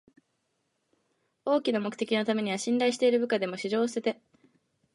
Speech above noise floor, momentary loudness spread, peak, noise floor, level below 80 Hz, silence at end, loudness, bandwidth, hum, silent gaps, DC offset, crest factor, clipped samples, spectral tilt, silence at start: 50 dB; 7 LU; -14 dBFS; -77 dBFS; -82 dBFS; 0.8 s; -28 LUFS; 11.5 kHz; none; none; under 0.1%; 16 dB; under 0.1%; -4.5 dB/octave; 1.45 s